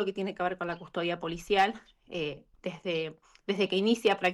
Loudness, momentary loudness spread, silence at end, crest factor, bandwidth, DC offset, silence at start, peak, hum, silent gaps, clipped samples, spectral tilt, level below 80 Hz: -31 LUFS; 14 LU; 0 s; 18 dB; 12.5 kHz; under 0.1%; 0 s; -14 dBFS; none; none; under 0.1%; -5 dB/octave; -62 dBFS